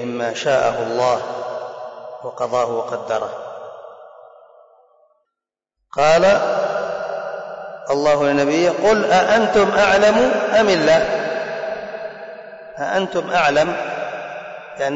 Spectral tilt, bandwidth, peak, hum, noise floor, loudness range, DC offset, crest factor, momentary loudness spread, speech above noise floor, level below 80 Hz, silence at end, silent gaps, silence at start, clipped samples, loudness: -4.5 dB/octave; 8 kHz; -6 dBFS; none; -83 dBFS; 11 LU; under 0.1%; 12 dB; 18 LU; 67 dB; -52 dBFS; 0 s; none; 0 s; under 0.1%; -18 LUFS